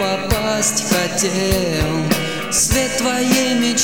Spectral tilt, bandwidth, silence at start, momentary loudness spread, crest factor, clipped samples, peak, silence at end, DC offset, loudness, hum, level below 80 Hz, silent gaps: -3 dB/octave; over 20 kHz; 0 s; 4 LU; 16 dB; under 0.1%; -2 dBFS; 0 s; 0.9%; -17 LUFS; none; -32 dBFS; none